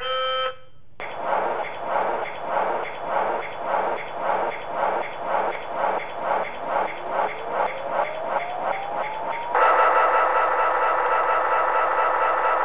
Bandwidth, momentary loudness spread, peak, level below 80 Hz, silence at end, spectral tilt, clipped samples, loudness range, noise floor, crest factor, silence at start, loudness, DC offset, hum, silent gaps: 4 kHz; 9 LU; -6 dBFS; -62 dBFS; 0 s; -6.5 dB/octave; under 0.1%; 6 LU; -46 dBFS; 16 dB; 0 s; -23 LUFS; 1%; none; none